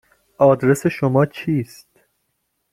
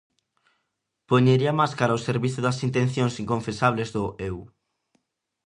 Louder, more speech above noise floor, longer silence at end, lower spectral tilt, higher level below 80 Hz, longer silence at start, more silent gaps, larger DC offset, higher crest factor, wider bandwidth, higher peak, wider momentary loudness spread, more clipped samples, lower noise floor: first, -18 LUFS vs -24 LUFS; about the same, 54 dB vs 56 dB; about the same, 1.1 s vs 1 s; about the same, -7.5 dB/octave vs -6.5 dB/octave; about the same, -56 dBFS vs -54 dBFS; second, 0.4 s vs 1.1 s; neither; neither; about the same, 18 dB vs 20 dB; first, 16 kHz vs 10.5 kHz; about the same, -2 dBFS vs -4 dBFS; about the same, 9 LU vs 10 LU; neither; second, -72 dBFS vs -79 dBFS